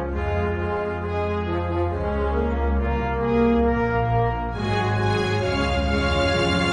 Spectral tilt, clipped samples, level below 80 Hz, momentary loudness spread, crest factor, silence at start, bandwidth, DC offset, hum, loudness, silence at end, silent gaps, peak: -6.5 dB/octave; under 0.1%; -30 dBFS; 5 LU; 14 dB; 0 s; 10.5 kHz; under 0.1%; none; -23 LUFS; 0 s; none; -8 dBFS